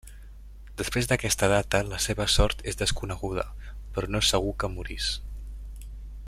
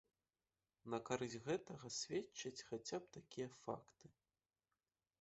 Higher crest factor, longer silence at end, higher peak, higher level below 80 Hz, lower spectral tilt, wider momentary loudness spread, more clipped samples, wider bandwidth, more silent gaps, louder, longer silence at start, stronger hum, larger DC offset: about the same, 22 dB vs 24 dB; second, 0 s vs 1.1 s; first, -6 dBFS vs -26 dBFS; first, -36 dBFS vs -82 dBFS; about the same, -3.5 dB/octave vs -4 dB/octave; first, 19 LU vs 8 LU; neither; first, 15.5 kHz vs 8 kHz; neither; first, -27 LUFS vs -48 LUFS; second, 0.05 s vs 0.85 s; neither; neither